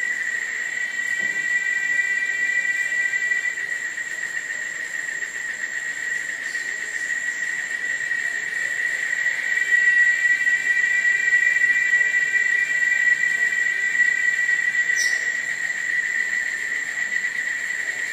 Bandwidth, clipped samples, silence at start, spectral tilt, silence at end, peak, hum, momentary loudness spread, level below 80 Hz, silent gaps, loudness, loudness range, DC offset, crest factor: 15.5 kHz; under 0.1%; 0 s; 1 dB/octave; 0 s; -8 dBFS; none; 9 LU; -76 dBFS; none; -20 LUFS; 8 LU; under 0.1%; 14 dB